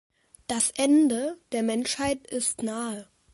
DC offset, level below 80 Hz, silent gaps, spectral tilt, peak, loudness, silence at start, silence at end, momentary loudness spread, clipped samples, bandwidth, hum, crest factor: under 0.1%; -60 dBFS; none; -3 dB/octave; -10 dBFS; -26 LUFS; 0.5 s; 0.3 s; 12 LU; under 0.1%; 12 kHz; none; 18 dB